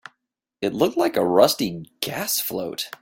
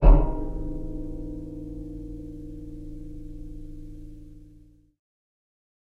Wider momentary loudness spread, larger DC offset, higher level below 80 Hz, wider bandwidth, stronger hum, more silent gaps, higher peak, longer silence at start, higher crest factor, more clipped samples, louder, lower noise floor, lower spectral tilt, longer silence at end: second, 12 LU vs 15 LU; neither; second, -62 dBFS vs -28 dBFS; first, 17 kHz vs 3 kHz; neither; neither; first, 0 dBFS vs -4 dBFS; first, 0.6 s vs 0 s; about the same, 22 dB vs 22 dB; neither; first, -22 LUFS vs -33 LUFS; first, -79 dBFS vs -53 dBFS; second, -3.5 dB/octave vs -10.5 dB/octave; second, 0.05 s vs 1.45 s